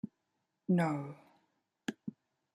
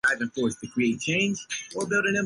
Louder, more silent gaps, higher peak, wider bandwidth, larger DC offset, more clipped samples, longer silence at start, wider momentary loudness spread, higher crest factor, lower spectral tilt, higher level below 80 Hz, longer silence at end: second, -36 LUFS vs -26 LUFS; neither; second, -20 dBFS vs -12 dBFS; about the same, 11 kHz vs 11.5 kHz; neither; neither; about the same, 0.05 s vs 0.05 s; first, 18 LU vs 7 LU; first, 20 dB vs 14 dB; first, -7.5 dB/octave vs -4 dB/octave; second, -80 dBFS vs -62 dBFS; first, 0.45 s vs 0 s